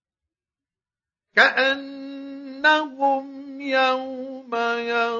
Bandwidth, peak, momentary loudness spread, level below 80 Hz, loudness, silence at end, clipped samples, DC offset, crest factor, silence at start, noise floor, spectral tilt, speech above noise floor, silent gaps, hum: 7.4 kHz; -2 dBFS; 19 LU; -74 dBFS; -21 LUFS; 0 s; under 0.1%; under 0.1%; 22 dB; 1.35 s; under -90 dBFS; -2.5 dB/octave; over 69 dB; none; none